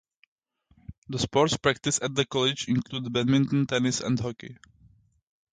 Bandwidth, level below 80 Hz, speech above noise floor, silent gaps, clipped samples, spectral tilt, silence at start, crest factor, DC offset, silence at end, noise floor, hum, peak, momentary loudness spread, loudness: 9.6 kHz; -56 dBFS; 38 dB; 0.98-1.02 s; under 0.1%; -4.5 dB/octave; 0.9 s; 20 dB; under 0.1%; 1 s; -64 dBFS; none; -8 dBFS; 9 LU; -26 LUFS